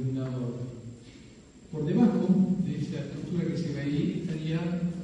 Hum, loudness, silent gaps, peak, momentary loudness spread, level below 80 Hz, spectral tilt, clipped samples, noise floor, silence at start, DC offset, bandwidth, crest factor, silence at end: none; -29 LUFS; none; -10 dBFS; 16 LU; -58 dBFS; -8.5 dB/octave; under 0.1%; -51 dBFS; 0 s; under 0.1%; 8.6 kHz; 18 dB; 0 s